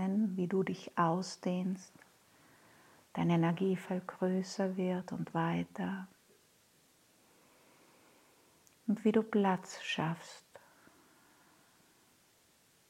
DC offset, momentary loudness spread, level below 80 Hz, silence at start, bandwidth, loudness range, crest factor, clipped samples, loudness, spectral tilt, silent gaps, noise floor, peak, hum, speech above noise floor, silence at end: under 0.1%; 14 LU; -82 dBFS; 0 s; 14 kHz; 8 LU; 20 dB; under 0.1%; -35 LUFS; -6.5 dB/octave; none; -68 dBFS; -16 dBFS; none; 34 dB; 2.5 s